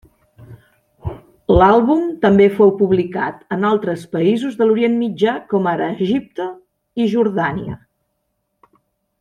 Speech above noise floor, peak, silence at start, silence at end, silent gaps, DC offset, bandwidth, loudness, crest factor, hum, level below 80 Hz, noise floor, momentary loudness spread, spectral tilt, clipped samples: 55 dB; -2 dBFS; 0.4 s; 1.45 s; none; under 0.1%; 9.8 kHz; -16 LUFS; 16 dB; none; -40 dBFS; -71 dBFS; 18 LU; -8 dB/octave; under 0.1%